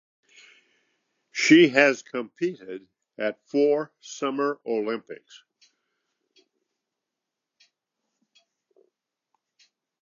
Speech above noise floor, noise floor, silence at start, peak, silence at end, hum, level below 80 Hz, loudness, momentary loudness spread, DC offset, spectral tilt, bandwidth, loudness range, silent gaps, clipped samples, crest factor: 62 dB; -86 dBFS; 1.35 s; -2 dBFS; 4.9 s; none; -88 dBFS; -23 LUFS; 23 LU; under 0.1%; -4 dB/octave; 7.6 kHz; 12 LU; none; under 0.1%; 24 dB